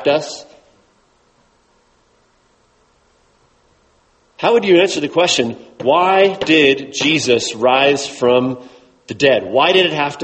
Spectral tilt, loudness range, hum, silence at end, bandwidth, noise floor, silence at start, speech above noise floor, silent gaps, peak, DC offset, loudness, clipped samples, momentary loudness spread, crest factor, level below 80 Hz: -3.5 dB/octave; 6 LU; none; 0 s; 8.8 kHz; -57 dBFS; 0 s; 43 dB; none; 0 dBFS; under 0.1%; -14 LUFS; under 0.1%; 10 LU; 16 dB; -58 dBFS